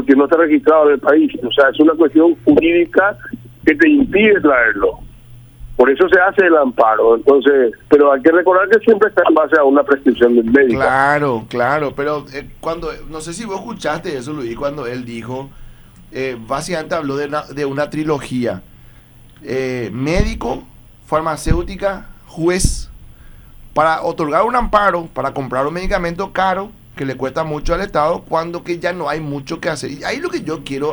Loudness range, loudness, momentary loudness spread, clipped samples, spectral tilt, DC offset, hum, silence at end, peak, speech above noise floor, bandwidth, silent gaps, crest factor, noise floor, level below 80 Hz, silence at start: 11 LU; -15 LUFS; 14 LU; under 0.1%; -5.5 dB/octave; under 0.1%; none; 0 s; 0 dBFS; 28 dB; over 20 kHz; none; 14 dB; -42 dBFS; -32 dBFS; 0 s